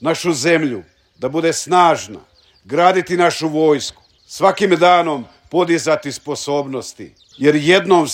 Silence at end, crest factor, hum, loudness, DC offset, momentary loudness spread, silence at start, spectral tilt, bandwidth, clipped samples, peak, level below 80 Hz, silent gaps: 0 s; 16 dB; none; -16 LUFS; under 0.1%; 14 LU; 0 s; -4.5 dB/octave; 16 kHz; under 0.1%; 0 dBFS; -60 dBFS; none